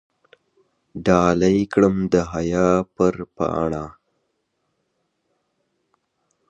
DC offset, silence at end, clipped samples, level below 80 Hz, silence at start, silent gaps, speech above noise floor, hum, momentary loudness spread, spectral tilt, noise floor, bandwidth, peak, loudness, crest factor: under 0.1%; 2.6 s; under 0.1%; -46 dBFS; 0.95 s; none; 54 dB; none; 9 LU; -7 dB/octave; -73 dBFS; 8.4 kHz; -2 dBFS; -20 LUFS; 20 dB